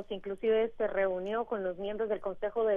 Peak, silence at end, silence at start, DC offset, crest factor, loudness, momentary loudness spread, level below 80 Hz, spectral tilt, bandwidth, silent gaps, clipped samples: -18 dBFS; 0 s; 0 s; under 0.1%; 12 dB; -33 LUFS; 6 LU; -58 dBFS; -7.5 dB/octave; 3.7 kHz; none; under 0.1%